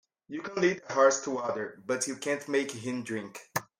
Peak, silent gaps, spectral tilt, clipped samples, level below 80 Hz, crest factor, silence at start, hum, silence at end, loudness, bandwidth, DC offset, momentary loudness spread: -10 dBFS; none; -3.5 dB/octave; under 0.1%; -76 dBFS; 20 dB; 0.3 s; none; 0.15 s; -30 LUFS; 16.5 kHz; under 0.1%; 12 LU